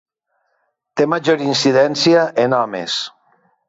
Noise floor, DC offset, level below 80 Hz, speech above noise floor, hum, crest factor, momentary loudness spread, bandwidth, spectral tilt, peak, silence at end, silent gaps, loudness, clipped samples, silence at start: -68 dBFS; under 0.1%; -64 dBFS; 53 dB; none; 16 dB; 9 LU; 8 kHz; -4.5 dB/octave; -2 dBFS; 0.6 s; none; -16 LUFS; under 0.1%; 0.95 s